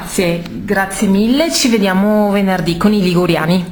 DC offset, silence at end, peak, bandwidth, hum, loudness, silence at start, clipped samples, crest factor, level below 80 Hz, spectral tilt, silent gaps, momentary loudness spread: under 0.1%; 0 s; 0 dBFS; 19.5 kHz; none; -13 LUFS; 0 s; under 0.1%; 12 dB; -38 dBFS; -5 dB/octave; none; 5 LU